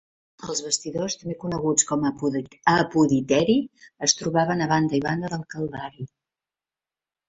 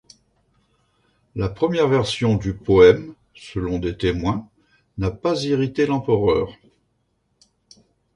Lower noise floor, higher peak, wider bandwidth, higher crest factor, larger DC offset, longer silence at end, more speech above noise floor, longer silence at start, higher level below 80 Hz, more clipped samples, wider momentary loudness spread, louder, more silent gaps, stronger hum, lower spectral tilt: first, under -90 dBFS vs -69 dBFS; about the same, -4 dBFS vs -2 dBFS; second, 8.4 kHz vs 11 kHz; about the same, 22 dB vs 20 dB; neither; second, 1.2 s vs 1.65 s; first, over 66 dB vs 50 dB; second, 0.4 s vs 1.35 s; second, -58 dBFS vs -42 dBFS; neither; second, 12 LU vs 17 LU; second, -23 LUFS vs -20 LUFS; neither; neither; second, -4 dB/octave vs -6.5 dB/octave